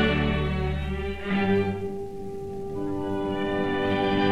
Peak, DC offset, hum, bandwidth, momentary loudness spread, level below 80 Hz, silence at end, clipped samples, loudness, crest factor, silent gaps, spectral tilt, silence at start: -10 dBFS; under 0.1%; none; 11.5 kHz; 11 LU; -38 dBFS; 0 s; under 0.1%; -27 LUFS; 16 dB; none; -7.5 dB/octave; 0 s